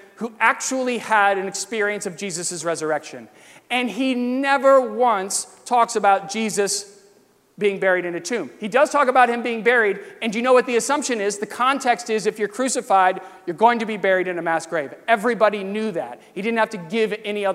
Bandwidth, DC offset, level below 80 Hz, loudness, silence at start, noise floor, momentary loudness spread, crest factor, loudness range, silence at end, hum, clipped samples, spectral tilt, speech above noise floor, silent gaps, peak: 15.5 kHz; under 0.1%; -74 dBFS; -20 LUFS; 0.2 s; -56 dBFS; 9 LU; 18 dB; 3 LU; 0 s; none; under 0.1%; -3 dB/octave; 36 dB; none; -2 dBFS